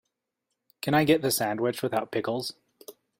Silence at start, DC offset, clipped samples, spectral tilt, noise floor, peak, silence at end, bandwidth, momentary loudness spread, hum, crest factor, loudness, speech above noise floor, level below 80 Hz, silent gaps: 0.85 s; under 0.1%; under 0.1%; -4.5 dB/octave; -83 dBFS; -8 dBFS; 0.3 s; 16.5 kHz; 11 LU; none; 20 dB; -27 LUFS; 57 dB; -66 dBFS; none